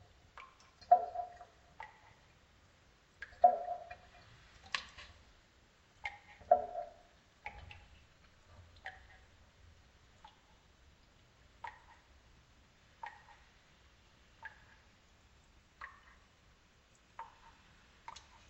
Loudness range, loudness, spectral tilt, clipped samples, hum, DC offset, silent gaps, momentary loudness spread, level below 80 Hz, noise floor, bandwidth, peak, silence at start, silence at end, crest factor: 20 LU; -37 LUFS; -3.5 dB/octave; under 0.1%; none; under 0.1%; none; 31 LU; -68 dBFS; -67 dBFS; 8.2 kHz; -14 dBFS; 0.35 s; 1.25 s; 30 dB